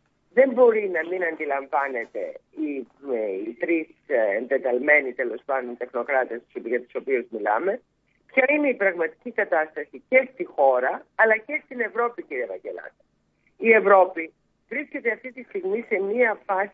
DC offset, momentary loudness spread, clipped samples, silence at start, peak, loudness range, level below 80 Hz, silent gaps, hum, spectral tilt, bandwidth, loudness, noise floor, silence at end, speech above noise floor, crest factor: under 0.1%; 13 LU; under 0.1%; 0.35 s; -4 dBFS; 4 LU; -76 dBFS; none; none; -8 dB/octave; 4.4 kHz; -23 LUFS; -67 dBFS; 0.05 s; 44 dB; 20 dB